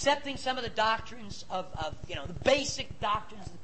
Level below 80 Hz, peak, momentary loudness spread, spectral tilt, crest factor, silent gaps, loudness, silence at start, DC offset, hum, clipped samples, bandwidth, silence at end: -50 dBFS; -10 dBFS; 12 LU; -3 dB/octave; 22 dB; none; -32 LUFS; 0 s; 0.8%; none; under 0.1%; 8.8 kHz; 0 s